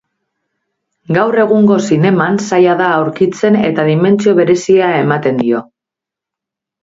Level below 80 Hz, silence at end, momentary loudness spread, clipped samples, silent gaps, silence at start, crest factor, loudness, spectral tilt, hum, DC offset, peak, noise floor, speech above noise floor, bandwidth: -56 dBFS; 1.2 s; 4 LU; under 0.1%; none; 1.1 s; 12 dB; -11 LUFS; -6.5 dB/octave; none; under 0.1%; 0 dBFS; -84 dBFS; 74 dB; 7.8 kHz